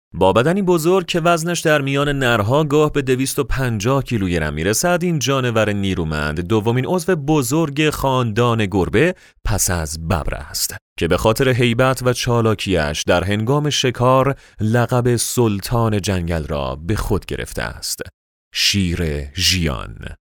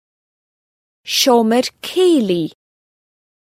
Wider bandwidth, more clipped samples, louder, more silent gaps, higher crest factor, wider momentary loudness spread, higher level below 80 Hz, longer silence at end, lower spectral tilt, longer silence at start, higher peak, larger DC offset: first, over 20 kHz vs 16.5 kHz; neither; second, -18 LUFS vs -15 LUFS; first, 10.81-10.96 s, 18.14-18.51 s vs none; about the same, 16 dB vs 18 dB; second, 8 LU vs 11 LU; first, -34 dBFS vs -68 dBFS; second, 0.2 s vs 1.05 s; about the same, -4.5 dB/octave vs -3.5 dB/octave; second, 0.15 s vs 1.05 s; about the same, 0 dBFS vs 0 dBFS; neither